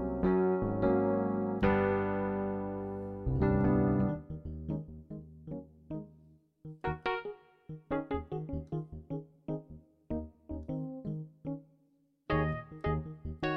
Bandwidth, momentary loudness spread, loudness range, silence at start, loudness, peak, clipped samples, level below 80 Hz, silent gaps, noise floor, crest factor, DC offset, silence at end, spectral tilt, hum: 5.8 kHz; 17 LU; 10 LU; 0 s; -34 LUFS; -16 dBFS; under 0.1%; -48 dBFS; none; -71 dBFS; 18 dB; under 0.1%; 0 s; -10 dB/octave; none